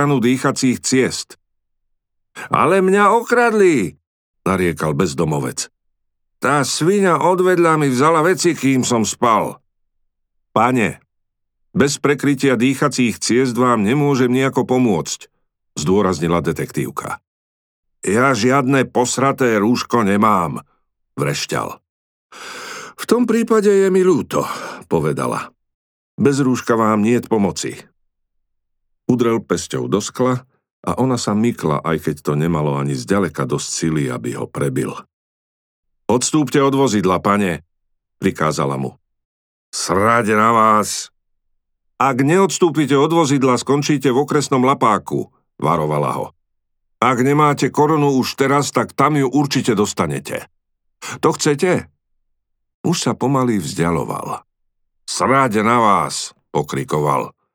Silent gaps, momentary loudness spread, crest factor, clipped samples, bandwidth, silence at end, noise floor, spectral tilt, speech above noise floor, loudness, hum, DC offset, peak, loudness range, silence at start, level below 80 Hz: 4.07-4.34 s, 17.27-17.83 s, 21.89-22.29 s, 25.74-26.18 s, 30.71-30.83 s, 35.13-35.83 s, 39.25-39.73 s, 52.74-52.84 s; 12 LU; 16 dB; under 0.1%; 19.5 kHz; 0.25 s; -72 dBFS; -5 dB/octave; 56 dB; -17 LUFS; none; under 0.1%; -2 dBFS; 5 LU; 0 s; -54 dBFS